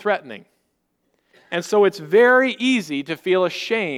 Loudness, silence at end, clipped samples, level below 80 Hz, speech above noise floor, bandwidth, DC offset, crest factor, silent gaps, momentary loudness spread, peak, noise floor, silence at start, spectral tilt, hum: -19 LUFS; 0 s; under 0.1%; -74 dBFS; 52 dB; 15.5 kHz; under 0.1%; 16 dB; none; 13 LU; -4 dBFS; -70 dBFS; 0 s; -4.5 dB/octave; none